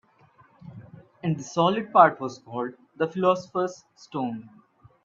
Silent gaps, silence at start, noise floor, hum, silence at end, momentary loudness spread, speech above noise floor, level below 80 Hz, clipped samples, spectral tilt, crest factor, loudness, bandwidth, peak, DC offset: none; 0.65 s; -58 dBFS; none; 0.55 s; 19 LU; 34 dB; -72 dBFS; under 0.1%; -6 dB/octave; 24 dB; -25 LUFS; 7.6 kHz; -2 dBFS; under 0.1%